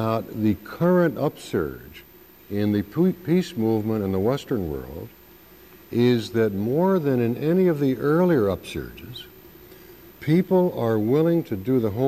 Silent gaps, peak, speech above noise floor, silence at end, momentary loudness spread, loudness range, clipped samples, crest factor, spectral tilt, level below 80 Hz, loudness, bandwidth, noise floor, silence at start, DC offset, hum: none; -8 dBFS; 27 dB; 0 s; 14 LU; 3 LU; under 0.1%; 14 dB; -8 dB/octave; -52 dBFS; -23 LUFS; 15 kHz; -49 dBFS; 0 s; under 0.1%; none